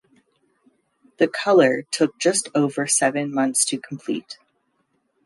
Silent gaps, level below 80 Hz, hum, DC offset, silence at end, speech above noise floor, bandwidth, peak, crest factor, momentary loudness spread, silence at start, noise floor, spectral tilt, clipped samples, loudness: none; -74 dBFS; none; under 0.1%; 0.9 s; 49 dB; 12 kHz; -4 dBFS; 18 dB; 13 LU; 1.2 s; -69 dBFS; -3 dB/octave; under 0.1%; -20 LUFS